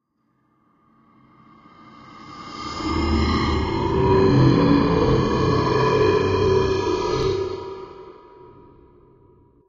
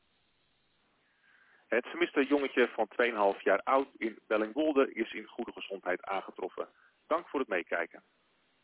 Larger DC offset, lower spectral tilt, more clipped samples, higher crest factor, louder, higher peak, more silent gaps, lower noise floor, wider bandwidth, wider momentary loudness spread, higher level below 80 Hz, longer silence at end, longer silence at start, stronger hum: neither; first, -7 dB/octave vs -1.5 dB/octave; neither; about the same, 18 dB vs 20 dB; first, -20 LUFS vs -32 LUFS; first, -4 dBFS vs -14 dBFS; neither; second, -67 dBFS vs -73 dBFS; first, 7.6 kHz vs 4 kHz; first, 18 LU vs 12 LU; first, -34 dBFS vs -76 dBFS; first, 1.55 s vs 0.65 s; first, 2.1 s vs 1.7 s; neither